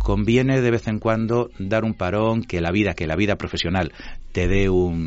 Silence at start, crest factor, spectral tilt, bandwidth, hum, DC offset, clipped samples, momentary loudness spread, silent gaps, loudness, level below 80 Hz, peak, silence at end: 0 s; 16 dB; -5.5 dB/octave; 8 kHz; none; under 0.1%; under 0.1%; 5 LU; none; -21 LUFS; -32 dBFS; -6 dBFS; 0 s